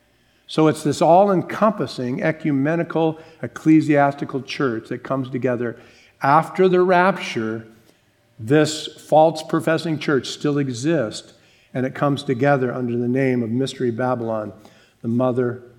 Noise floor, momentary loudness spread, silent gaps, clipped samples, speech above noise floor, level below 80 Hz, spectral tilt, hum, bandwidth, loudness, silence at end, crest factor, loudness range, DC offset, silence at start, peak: -58 dBFS; 13 LU; none; under 0.1%; 38 dB; -66 dBFS; -6.5 dB/octave; none; 13 kHz; -20 LUFS; 0.15 s; 18 dB; 3 LU; under 0.1%; 0.5 s; -2 dBFS